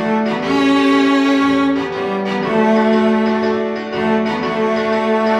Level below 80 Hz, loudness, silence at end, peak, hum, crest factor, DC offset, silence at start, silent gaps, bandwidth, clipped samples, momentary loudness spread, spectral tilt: -52 dBFS; -15 LUFS; 0 s; -4 dBFS; none; 12 dB; under 0.1%; 0 s; none; 9.6 kHz; under 0.1%; 6 LU; -6 dB/octave